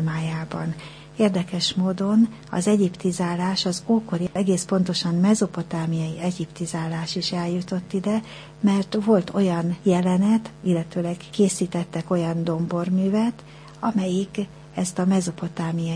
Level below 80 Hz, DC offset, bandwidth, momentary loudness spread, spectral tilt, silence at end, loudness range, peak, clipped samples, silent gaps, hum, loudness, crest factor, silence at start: -56 dBFS; under 0.1%; 10.5 kHz; 8 LU; -6 dB/octave; 0 s; 3 LU; -6 dBFS; under 0.1%; none; none; -23 LUFS; 16 dB; 0 s